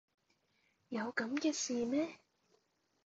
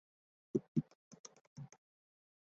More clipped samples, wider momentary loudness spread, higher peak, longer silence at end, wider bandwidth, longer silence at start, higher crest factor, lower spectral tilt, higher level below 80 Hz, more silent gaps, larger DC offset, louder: neither; second, 7 LU vs 19 LU; about the same, -22 dBFS vs -20 dBFS; about the same, 0.9 s vs 0.85 s; about the same, 8 kHz vs 7.6 kHz; first, 0.9 s vs 0.55 s; second, 20 dB vs 26 dB; second, -3 dB/octave vs -10 dB/octave; about the same, -82 dBFS vs -80 dBFS; second, none vs 0.68-0.75 s, 0.95-1.11 s, 1.19-1.24 s, 1.41-1.56 s; neither; first, -38 LUFS vs -41 LUFS